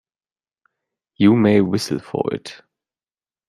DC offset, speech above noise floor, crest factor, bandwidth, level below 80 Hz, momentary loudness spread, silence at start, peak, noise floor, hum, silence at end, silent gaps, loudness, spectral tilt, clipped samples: under 0.1%; over 73 dB; 18 dB; 13.5 kHz; -58 dBFS; 13 LU; 1.2 s; -2 dBFS; under -90 dBFS; none; 0.95 s; none; -18 LUFS; -6.5 dB/octave; under 0.1%